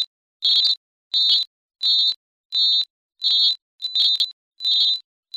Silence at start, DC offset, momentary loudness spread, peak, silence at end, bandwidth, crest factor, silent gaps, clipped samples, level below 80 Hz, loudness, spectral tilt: 0 s; under 0.1%; 10 LU; -6 dBFS; 0.35 s; 15.5 kHz; 16 dB; 0.07-0.40 s, 0.77-1.11 s, 1.47-1.69 s, 2.16-2.50 s, 2.90-3.09 s, 3.62-3.79 s, 4.33-4.51 s; under 0.1%; -78 dBFS; -18 LUFS; 3 dB/octave